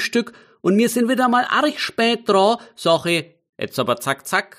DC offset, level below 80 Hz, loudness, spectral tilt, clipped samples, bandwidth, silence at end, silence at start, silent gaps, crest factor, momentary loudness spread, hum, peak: under 0.1%; -68 dBFS; -19 LUFS; -4 dB/octave; under 0.1%; 15.5 kHz; 0.15 s; 0 s; 3.49-3.53 s; 16 dB; 7 LU; none; -4 dBFS